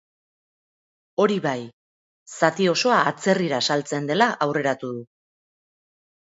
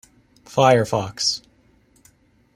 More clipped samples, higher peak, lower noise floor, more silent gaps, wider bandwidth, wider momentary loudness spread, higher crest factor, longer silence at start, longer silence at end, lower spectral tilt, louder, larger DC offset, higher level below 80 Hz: neither; about the same, -2 dBFS vs -2 dBFS; first, under -90 dBFS vs -58 dBFS; first, 1.73-2.26 s vs none; second, 8 kHz vs 16 kHz; about the same, 13 LU vs 11 LU; about the same, 22 dB vs 22 dB; first, 1.2 s vs 0.5 s; about the same, 1.3 s vs 1.2 s; about the same, -4.5 dB/octave vs -4 dB/octave; about the same, -22 LUFS vs -20 LUFS; neither; second, -72 dBFS vs -58 dBFS